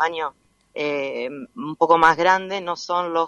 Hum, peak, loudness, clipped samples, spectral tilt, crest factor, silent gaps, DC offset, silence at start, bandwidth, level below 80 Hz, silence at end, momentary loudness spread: none; -2 dBFS; -20 LUFS; under 0.1%; -4 dB/octave; 18 dB; none; under 0.1%; 0 s; 10.5 kHz; -62 dBFS; 0 s; 17 LU